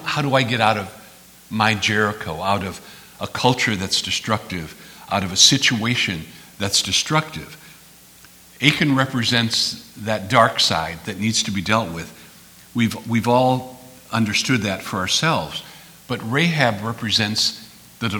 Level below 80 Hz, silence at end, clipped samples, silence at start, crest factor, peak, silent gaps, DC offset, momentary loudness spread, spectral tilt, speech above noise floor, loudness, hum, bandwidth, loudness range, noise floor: -54 dBFS; 0 s; under 0.1%; 0 s; 22 dB; 0 dBFS; none; under 0.1%; 15 LU; -3.5 dB/octave; 27 dB; -19 LUFS; none; over 20 kHz; 3 LU; -47 dBFS